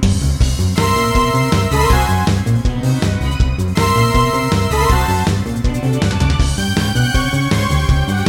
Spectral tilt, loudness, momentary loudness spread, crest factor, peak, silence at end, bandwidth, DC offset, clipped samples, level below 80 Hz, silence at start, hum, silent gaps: -5.5 dB/octave; -15 LUFS; 4 LU; 12 dB; -2 dBFS; 0 s; 18 kHz; under 0.1%; under 0.1%; -20 dBFS; 0 s; none; none